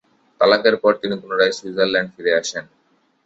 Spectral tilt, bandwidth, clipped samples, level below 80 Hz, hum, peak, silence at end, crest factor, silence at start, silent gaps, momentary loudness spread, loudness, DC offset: -3.5 dB/octave; 8 kHz; under 0.1%; -62 dBFS; none; -2 dBFS; 0.65 s; 18 dB; 0.4 s; none; 9 LU; -18 LUFS; under 0.1%